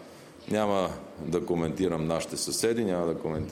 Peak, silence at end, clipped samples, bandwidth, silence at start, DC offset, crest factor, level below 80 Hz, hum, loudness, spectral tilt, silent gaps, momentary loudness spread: -12 dBFS; 0 s; under 0.1%; 16.5 kHz; 0 s; under 0.1%; 16 dB; -56 dBFS; none; -29 LUFS; -5 dB/octave; none; 7 LU